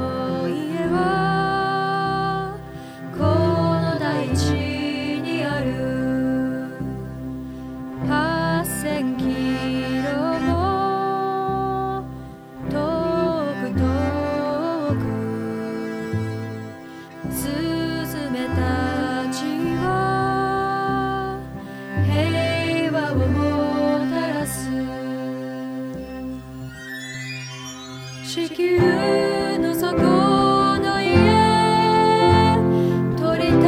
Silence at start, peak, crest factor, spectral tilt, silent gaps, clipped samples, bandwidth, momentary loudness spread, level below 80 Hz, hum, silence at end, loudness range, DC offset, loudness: 0 s; -2 dBFS; 20 dB; -6 dB/octave; none; under 0.1%; 19.5 kHz; 15 LU; -42 dBFS; none; 0 s; 9 LU; under 0.1%; -21 LUFS